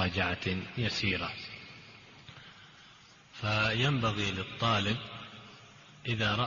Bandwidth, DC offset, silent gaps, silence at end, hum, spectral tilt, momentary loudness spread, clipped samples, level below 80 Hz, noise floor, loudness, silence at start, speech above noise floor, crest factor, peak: 7.2 kHz; under 0.1%; none; 0 s; none; -3 dB/octave; 23 LU; under 0.1%; -58 dBFS; -57 dBFS; -31 LUFS; 0 s; 26 dB; 16 dB; -16 dBFS